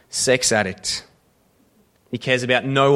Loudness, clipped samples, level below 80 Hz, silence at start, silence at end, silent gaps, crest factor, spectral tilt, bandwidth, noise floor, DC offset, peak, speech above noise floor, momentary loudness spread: -20 LUFS; under 0.1%; -56 dBFS; 0.1 s; 0 s; none; 20 dB; -3 dB/octave; 15.5 kHz; -60 dBFS; under 0.1%; -2 dBFS; 41 dB; 12 LU